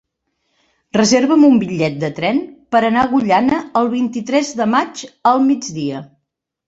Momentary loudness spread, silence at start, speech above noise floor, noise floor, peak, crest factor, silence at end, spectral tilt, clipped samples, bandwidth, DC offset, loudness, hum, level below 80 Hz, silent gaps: 10 LU; 0.95 s; 59 dB; -74 dBFS; -2 dBFS; 14 dB; 0.65 s; -5 dB/octave; under 0.1%; 8 kHz; under 0.1%; -16 LUFS; none; -54 dBFS; none